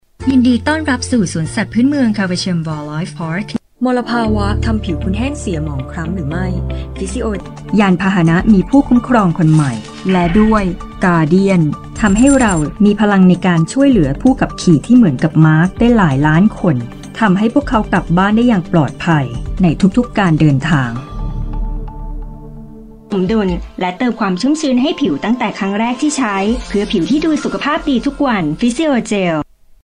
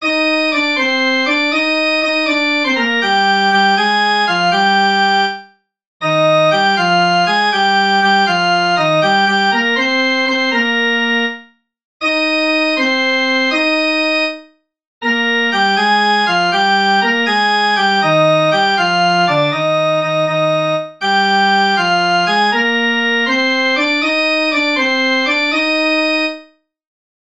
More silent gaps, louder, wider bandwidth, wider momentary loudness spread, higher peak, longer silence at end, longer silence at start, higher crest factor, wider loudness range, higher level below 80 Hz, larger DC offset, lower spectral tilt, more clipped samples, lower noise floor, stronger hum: second, none vs 5.87-6.00 s, 11.85-12.00 s, 14.87-15.01 s; about the same, -14 LUFS vs -13 LUFS; about the same, 10.5 kHz vs 10.5 kHz; first, 11 LU vs 3 LU; about the same, 0 dBFS vs 0 dBFS; second, 0.4 s vs 0.85 s; first, 0.2 s vs 0 s; about the same, 12 dB vs 14 dB; first, 7 LU vs 2 LU; first, -28 dBFS vs -66 dBFS; second, under 0.1% vs 0.2%; first, -6.5 dB/octave vs -4 dB/octave; neither; second, -34 dBFS vs -44 dBFS; neither